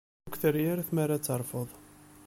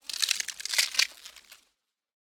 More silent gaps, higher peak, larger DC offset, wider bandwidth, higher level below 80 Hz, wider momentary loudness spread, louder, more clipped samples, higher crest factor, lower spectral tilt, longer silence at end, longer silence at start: neither; second, -14 dBFS vs -6 dBFS; neither; second, 17 kHz vs over 20 kHz; first, -64 dBFS vs -76 dBFS; second, 12 LU vs 19 LU; second, -31 LUFS vs -27 LUFS; neither; second, 18 dB vs 26 dB; first, -6 dB/octave vs 5 dB/octave; second, 0 s vs 0.75 s; first, 0.25 s vs 0.1 s